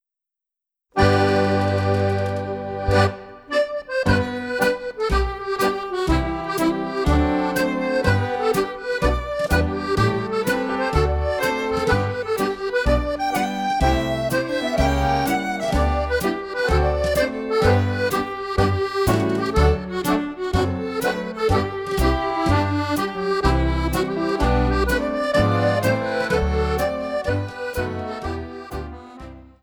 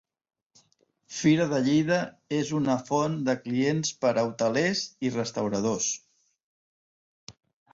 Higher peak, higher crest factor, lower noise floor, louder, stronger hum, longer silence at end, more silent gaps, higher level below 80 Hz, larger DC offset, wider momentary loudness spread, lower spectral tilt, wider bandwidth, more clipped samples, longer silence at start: first, -2 dBFS vs -10 dBFS; about the same, 18 dB vs 18 dB; first, -87 dBFS vs -68 dBFS; first, -21 LUFS vs -27 LUFS; neither; second, 0.2 s vs 0.45 s; second, none vs 6.43-7.27 s; first, -30 dBFS vs -66 dBFS; neither; about the same, 6 LU vs 6 LU; first, -6 dB/octave vs -4.5 dB/octave; first, over 20 kHz vs 7.8 kHz; neither; second, 0.95 s vs 1.1 s